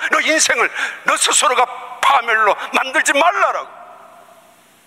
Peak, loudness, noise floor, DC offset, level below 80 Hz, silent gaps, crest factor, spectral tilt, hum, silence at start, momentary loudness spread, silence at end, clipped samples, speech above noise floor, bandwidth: -2 dBFS; -14 LUFS; -48 dBFS; under 0.1%; -66 dBFS; none; 16 dB; 1 dB/octave; none; 0 s; 6 LU; 0.9 s; under 0.1%; 33 dB; 16 kHz